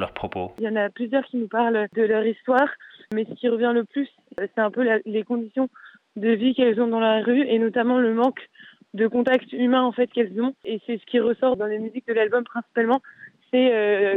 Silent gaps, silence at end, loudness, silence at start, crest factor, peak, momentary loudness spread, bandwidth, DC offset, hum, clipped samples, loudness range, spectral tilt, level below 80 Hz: none; 0 s; -23 LUFS; 0 s; 14 dB; -8 dBFS; 9 LU; 4.2 kHz; under 0.1%; none; under 0.1%; 3 LU; -7.5 dB/octave; -64 dBFS